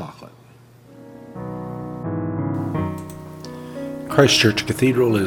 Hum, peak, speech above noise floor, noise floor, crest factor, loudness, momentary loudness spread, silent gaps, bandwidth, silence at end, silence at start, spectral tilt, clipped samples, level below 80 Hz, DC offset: none; 0 dBFS; 31 dB; -48 dBFS; 22 dB; -20 LUFS; 21 LU; none; 18 kHz; 0 s; 0 s; -5 dB/octave; under 0.1%; -52 dBFS; under 0.1%